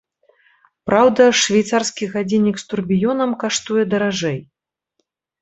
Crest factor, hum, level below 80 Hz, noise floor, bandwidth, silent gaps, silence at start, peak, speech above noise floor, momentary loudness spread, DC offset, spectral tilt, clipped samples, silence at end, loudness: 18 dB; none; -56 dBFS; -72 dBFS; 8.2 kHz; none; 0.85 s; 0 dBFS; 56 dB; 11 LU; under 0.1%; -4 dB/octave; under 0.1%; 1 s; -17 LUFS